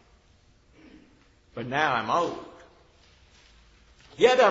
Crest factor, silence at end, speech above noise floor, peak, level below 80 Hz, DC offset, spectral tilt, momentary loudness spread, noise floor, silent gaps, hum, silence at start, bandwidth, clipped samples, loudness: 22 dB; 0 s; 37 dB; -6 dBFS; -62 dBFS; under 0.1%; -4 dB/octave; 22 LU; -60 dBFS; none; none; 1.55 s; 8 kHz; under 0.1%; -25 LUFS